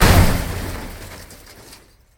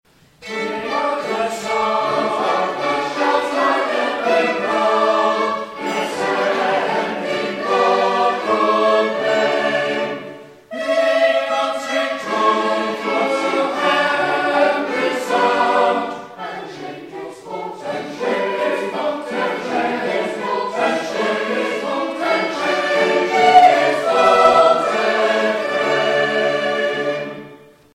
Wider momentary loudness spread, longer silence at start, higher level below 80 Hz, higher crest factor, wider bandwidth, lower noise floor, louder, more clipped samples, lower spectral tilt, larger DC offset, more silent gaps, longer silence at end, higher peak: first, 26 LU vs 11 LU; second, 0 s vs 0.4 s; first, -24 dBFS vs -62 dBFS; about the same, 18 dB vs 18 dB; first, 19 kHz vs 15 kHz; first, -46 dBFS vs -42 dBFS; about the same, -19 LUFS vs -18 LUFS; neither; first, -5 dB/octave vs -3.5 dB/octave; neither; neither; first, 0.85 s vs 0.35 s; about the same, 0 dBFS vs 0 dBFS